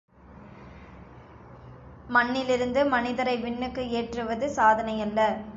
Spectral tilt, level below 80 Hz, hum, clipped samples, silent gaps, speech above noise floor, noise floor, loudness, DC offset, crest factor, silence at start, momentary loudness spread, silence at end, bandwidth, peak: -5 dB/octave; -52 dBFS; none; under 0.1%; none; 23 dB; -48 dBFS; -26 LUFS; under 0.1%; 20 dB; 0.3 s; 25 LU; 0 s; 7.8 kHz; -8 dBFS